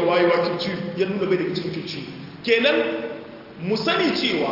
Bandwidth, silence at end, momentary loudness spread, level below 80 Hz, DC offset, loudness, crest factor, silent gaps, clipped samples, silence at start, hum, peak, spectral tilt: 5.8 kHz; 0 s; 14 LU; -62 dBFS; under 0.1%; -22 LUFS; 18 dB; none; under 0.1%; 0 s; none; -4 dBFS; -6 dB/octave